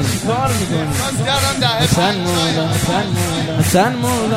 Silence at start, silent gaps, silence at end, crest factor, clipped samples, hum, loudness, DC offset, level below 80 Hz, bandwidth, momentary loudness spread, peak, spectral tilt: 0 s; none; 0 s; 14 dB; under 0.1%; none; -16 LUFS; under 0.1%; -38 dBFS; 16 kHz; 4 LU; -2 dBFS; -4.5 dB/octave